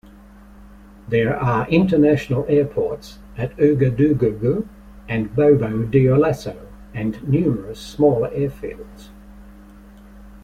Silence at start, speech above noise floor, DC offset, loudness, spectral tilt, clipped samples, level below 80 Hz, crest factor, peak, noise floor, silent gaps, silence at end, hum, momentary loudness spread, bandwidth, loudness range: 0.6 s; 26 dB; under 0.1%; -19 LUFS; -8.5 dB/octave; under 0.1%; -42 dBFS; 16 dB; -4 dBFS; -44 dBFS; none; 0.05 s; none; 17 LU; 13.5 kHz; 5 LU